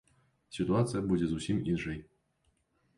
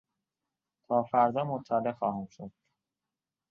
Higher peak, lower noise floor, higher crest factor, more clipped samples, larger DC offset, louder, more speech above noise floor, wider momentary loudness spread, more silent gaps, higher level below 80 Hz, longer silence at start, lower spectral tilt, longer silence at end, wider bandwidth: second, -16 dBFS vs -12 dBFS; second, -75 dBFS vs under -90 dBFS; about the same, 18 dB vs 20 dB; neither; neither; about the same, -32 LUFS vs -30 LUFS; second, 44 dB vs over 60 dB; second, 11 LU vs 19 LU; neither; first, -54 dBFS vs -72 dBFS; second, 0.5 s vs 0.9 s; second, -7 dB/octave vs -8.5 dB/octave; about the same, 0.95 s vs 1 s; first, 11.5 kHz vs 6.8 kHz